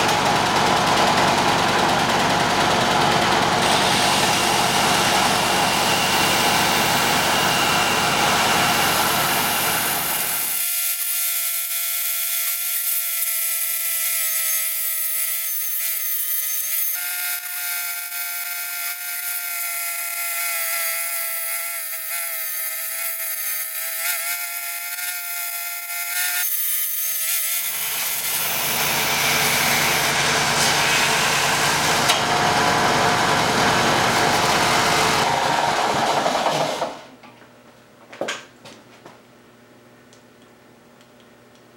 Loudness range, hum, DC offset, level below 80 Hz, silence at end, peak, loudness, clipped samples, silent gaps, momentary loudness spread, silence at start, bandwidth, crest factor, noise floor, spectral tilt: 6 LU; none; under 0.1%; -52 dBFS; 2.65 s; -2 dBFS; -19 LUFS; under 0.1%; none; 7 LU; 0 s; 17 kHz; 18 dB; -49 dBFS; -1.5 dB/octave